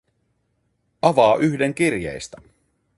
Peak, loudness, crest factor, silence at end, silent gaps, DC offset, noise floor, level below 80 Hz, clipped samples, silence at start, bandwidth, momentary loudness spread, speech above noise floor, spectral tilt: -2 dBFS; -19 LUFS; 20 dB; 0.7 s; none; under 0.1%; -69 dBFS; -54 dBFS; under 0.1%; 1.05 s; 11.5 kHz; 17 LU; 50 dB; -5.5 dB/octave